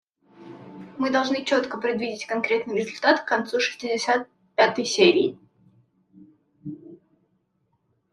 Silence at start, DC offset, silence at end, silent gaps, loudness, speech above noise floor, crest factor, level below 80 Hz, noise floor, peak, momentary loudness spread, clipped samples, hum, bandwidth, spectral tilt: 0.4 s; under 0.1%; 1.2 s; none; -23 LUFS; 48 dB; 22 dB; -72 dBFS; -71 dBFS; -4 dBFS; 22 LU; under 0.1%; none; 11 kHz; -3.5 dB/octave